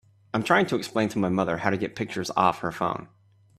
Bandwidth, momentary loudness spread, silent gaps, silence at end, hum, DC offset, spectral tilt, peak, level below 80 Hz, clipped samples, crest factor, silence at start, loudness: 14.5 kHz; 8 LU; none; 0.5 s; none; under 0.1%; -5.5 dB/octave; -6 dBFS; -60 dBFS; under 0.1%; 22 dB; 0.35 s; -26 LUFS